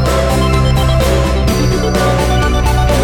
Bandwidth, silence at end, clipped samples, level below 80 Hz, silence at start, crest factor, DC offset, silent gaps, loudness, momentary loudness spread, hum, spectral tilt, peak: 17.5 kHz; 0 s; under 0.1%; -16 dBFS; 0 s; 10 dB; under 0.1%; none; -13 LUFS; 1 LU; none; -5.5 dB/octave; -2 dBFS